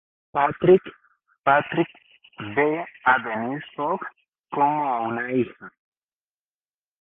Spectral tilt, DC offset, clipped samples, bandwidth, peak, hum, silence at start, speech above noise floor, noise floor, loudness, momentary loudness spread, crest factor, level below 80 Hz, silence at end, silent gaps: -10 dB/octave; under 0.1%; under 0.1%; 3.8 kHz; -4 dBFS; none; 0.35 s; over 68 dB; under -90 dBFS; -23 LUFS; 12 LU; 20 dB; -62 dBFS; 1.3 s; 4.28-4.32 s, 4.39-4.43 s